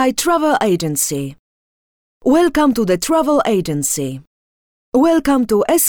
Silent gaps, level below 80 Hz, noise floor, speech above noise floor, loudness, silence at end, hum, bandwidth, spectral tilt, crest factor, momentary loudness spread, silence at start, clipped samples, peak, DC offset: 1.39-2.21 s, 4.27-4.92 s; -46 dBFS; under -90 dBFS; over 75 dB; -16 LUFS; 0 s; none; 20 kHz; -4.5 dB/octave; 12 dB; 8 LU; 0 s; under 0.1%; -4 dBFS; under 0.1%